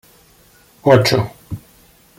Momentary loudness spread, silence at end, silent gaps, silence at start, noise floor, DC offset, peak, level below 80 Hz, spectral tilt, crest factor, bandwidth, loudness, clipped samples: 21 LU; 0.6 s; none; 0.85 s; -50 dBFS; under 0.1%; -2 dBFS; -48 dBFS; -5.5 dB/octave; 18 dB; 16.5 kHz; -15 LUFS; under 0.1%